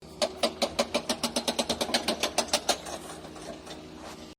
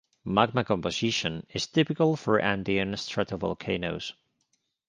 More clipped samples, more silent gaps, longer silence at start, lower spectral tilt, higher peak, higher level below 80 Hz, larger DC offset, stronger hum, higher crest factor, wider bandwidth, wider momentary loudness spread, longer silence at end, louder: neither; neither; second, 0 s vs 0.25 s; second, -2 dB/octave vs -5 dB/octave; second, -10 dBFS vs -6 dBFS; about the same, -58 dBFS vs -56 dBFS; neither; neither; about the same, 22 dB vs 22 dB; first, over 20 kHz vs 10 kHz; first, 15 LU vs 7 LU; second, 0.05 s vs 0.75 s; about the same, -29 LUFS vs -27 LUFS